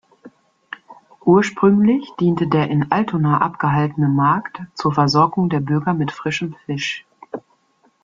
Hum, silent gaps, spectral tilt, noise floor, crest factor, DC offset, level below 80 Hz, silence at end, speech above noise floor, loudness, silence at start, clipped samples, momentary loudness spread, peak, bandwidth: none; none; -7 dB/octave; -60 dBFS; 16 dB; under 0.1%; -56 dBFS; 0.65 s; 43 dB; -18 LUFS; 0.25 s; under 0.1%; 19 LU; -2 dBFS; 7.6 kHz